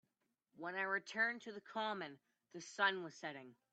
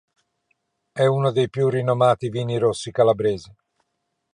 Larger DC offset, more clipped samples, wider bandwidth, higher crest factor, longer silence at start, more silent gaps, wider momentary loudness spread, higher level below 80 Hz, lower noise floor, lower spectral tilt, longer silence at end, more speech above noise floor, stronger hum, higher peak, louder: neither; neither; second, 8.8 kHz vs 10.5 kHz; about the same, 22 dB vs 18 dB; second, 0.55 s vs 0.95 s; neither; first, 15 LU vs 6 LU; second, under -90 dBFS vs -58 dBFS; first, -86 dBFS vs -76 dBFS; second, -3 dB/octave vs -6.5 dB/octave; second, 0.2 s vs 0.9 s; second, 43 dB vs 56 dB; neither; second, -22 dBFS vs -4 dBFS; second, -41 LUFS vs -21 LUFS